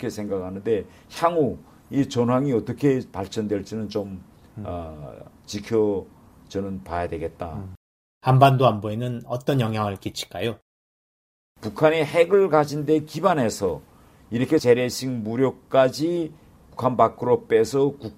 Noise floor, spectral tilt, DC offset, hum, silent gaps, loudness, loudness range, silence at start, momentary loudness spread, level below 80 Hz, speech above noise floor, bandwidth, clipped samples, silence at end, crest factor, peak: under -90 dBFS; -6.5 dB/octave; under 0.1%; none; 7.77-8.21 s, 10.62-11.55 s; -23 LUFS; 7 LU; 0 s; 16 LU; -54 dBFS; over 68 dB; 16 kHz; under 0.1%; 0.05 s; 22 dB; -2 dBFS